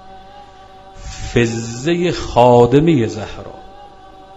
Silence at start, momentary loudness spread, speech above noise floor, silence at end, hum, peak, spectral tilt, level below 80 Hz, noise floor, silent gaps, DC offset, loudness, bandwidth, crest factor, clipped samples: 0.05 s; 23 LU; 26 dB; 0 s; none; 0 dBFS; -6.5 dB/octave; -36 dBFS; -40 dBFS; none; 0.3%; -14 LUFS; 8 kHz; 16 dB; under 0.1%